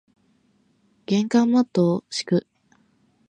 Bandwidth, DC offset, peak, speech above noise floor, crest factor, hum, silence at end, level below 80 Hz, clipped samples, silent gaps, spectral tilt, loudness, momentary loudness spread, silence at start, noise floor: 10 kHz; under 0.1%; -8 dBFS; 43 dB; 16 dB; none; 0.9 s; -70 dBFS; under 0.1%; none; -6 dB/octave; -22 LUFS; 7 LU; 1.1 s; -64 dBFS